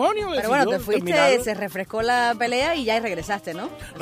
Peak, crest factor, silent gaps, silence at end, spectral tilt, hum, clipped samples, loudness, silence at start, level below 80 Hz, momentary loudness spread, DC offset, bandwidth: -4 dBFS; 18 dB; none; 0 s; -4 dB/octave; none; under 0.1%; -22 LUFS; 0 s; -48 dBFS; 10 LU; under 0.1%; 15.5 kHz